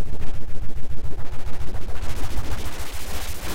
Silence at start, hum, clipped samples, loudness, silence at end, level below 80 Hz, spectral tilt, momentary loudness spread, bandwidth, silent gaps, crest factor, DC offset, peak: 0 s; none; under 0.1%; -34 LUFS; 0 s; -30 dBFS; -4.5 dB/octave; 5 LU; 16 kHz; none; 8 dB; under 0.1%; -6 dBFS